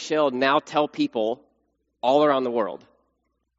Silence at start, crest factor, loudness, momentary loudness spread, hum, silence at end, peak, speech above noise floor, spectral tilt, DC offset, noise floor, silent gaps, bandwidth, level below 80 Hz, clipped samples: 0 s; 18 dB; -23 LUFS; 10 LU; none; 0.85 s; -6 dBFS; 52 dB; -2.5 dB/octave; under 0.1%; -74 dBFS; none; 7.6 kHz; -74 dBFS; under 0.1%